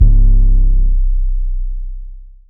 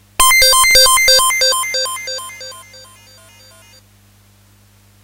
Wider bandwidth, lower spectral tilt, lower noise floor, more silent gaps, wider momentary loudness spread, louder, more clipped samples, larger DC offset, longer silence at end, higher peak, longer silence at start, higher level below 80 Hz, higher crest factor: second, 0.6 kHz vs 16.5 kHz; first, -14 dB/octave vs 2 dB/octave; second, -30 dBFS vs -49 dBFS; neither; second, 18 LU vs 21 LU; second, -17 LUFS vs -9 LUFS; neither; neither; second, 0.25 s vs 2.4 s; about the same, 0 dBFS vs 0 dBFS; second, 0 s vs 0.2 s; first, -10 dBFS vs -38 dBFS; second, 10 dB vs 16 dB